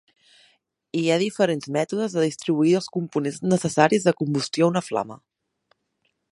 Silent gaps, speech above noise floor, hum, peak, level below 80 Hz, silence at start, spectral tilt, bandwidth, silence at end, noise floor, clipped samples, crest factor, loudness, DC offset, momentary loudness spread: none; 51 dB; none; -2 dBFS; -68 dBFS; 0.95 s; -5.5 dB/octave; 11.5 kHz; 1.15 s; -73 dBFS; under 0.1%; 22 dB; -23 LUFS; under 0.1%; 8 LU